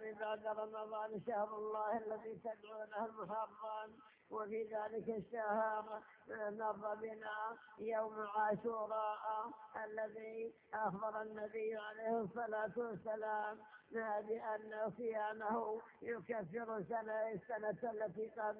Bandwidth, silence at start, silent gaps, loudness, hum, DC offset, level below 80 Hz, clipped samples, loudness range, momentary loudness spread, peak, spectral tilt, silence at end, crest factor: 4 kHz; 0 s; none; -44 LUFS; none; under 0.1%; -84 dBFS; under 0.1%; 2 LU; 7 LU; -26 dBFS; -4.5 dB/octave; 0 s; 18 dB